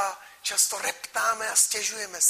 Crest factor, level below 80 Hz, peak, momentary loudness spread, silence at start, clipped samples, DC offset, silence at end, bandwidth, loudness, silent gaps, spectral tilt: 20 dB; -72 dBFS; -8 dBFS; 9 LU; 0 s; under 0.1%; under 0.1%; 0 s; 15.5 kHz; -24 LUFS; none; 2.5 dB/octave